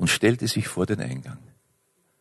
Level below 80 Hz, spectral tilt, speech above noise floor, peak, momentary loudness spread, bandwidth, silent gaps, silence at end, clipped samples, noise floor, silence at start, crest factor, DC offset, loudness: -52 dBFS; -4.5 dB/octave; 44 dB; -8 dBFS; 20 LU; 12.5 kHz; none; 0.85 s; under 0.1%; -68 dBFS; 0 s; 18 dB; under 0.1%; -25 LUFS